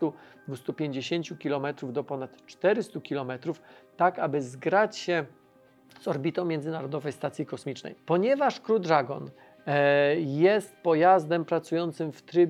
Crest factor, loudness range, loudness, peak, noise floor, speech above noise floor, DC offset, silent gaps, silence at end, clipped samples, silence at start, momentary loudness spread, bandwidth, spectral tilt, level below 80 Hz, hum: 20 dB; 7 LU; -28 LUFS; -8 dBFS; -59 dBFS; 32 dB; under 0.1%; none; 0 s; under 0.1%; 0 s; 14 LU; 12.5 kHz; -6.5 dB/octave; -82 dBFS; none